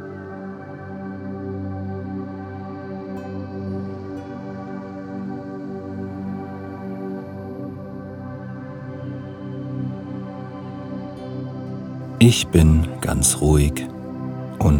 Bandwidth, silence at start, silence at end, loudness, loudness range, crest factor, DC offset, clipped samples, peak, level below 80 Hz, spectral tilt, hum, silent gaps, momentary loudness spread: 18.5 kHz; 0 s; 0 s; -25 LUFS; 13 LU; 24 dB; under 0.1%; under 0.1%; 0 dBFS; -32 dBFS; -5.5 dB/octave; none; none; 17 LU